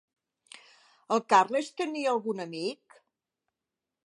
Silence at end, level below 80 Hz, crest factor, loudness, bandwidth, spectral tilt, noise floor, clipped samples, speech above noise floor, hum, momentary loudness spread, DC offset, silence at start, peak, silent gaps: 1.3 s; -88 dBFS; 22 dB; -28 LUFS; 11.5 kHz; -4 dB/octave; -89 dBFS; under 0.1%; 61 dB; none; 12 LU; under 0.1%; 1.1 s; -10 dBFS; none